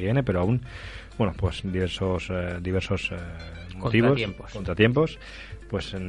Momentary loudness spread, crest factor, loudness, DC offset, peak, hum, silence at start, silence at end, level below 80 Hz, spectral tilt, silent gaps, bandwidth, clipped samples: 18 LU; 22 dB; -26 LUFS; under 0.1%; -4 dBFS; none; 0 s; 0 s; -44 dBFS; -7 dB/octave; none; 11 kHz; under 0.1%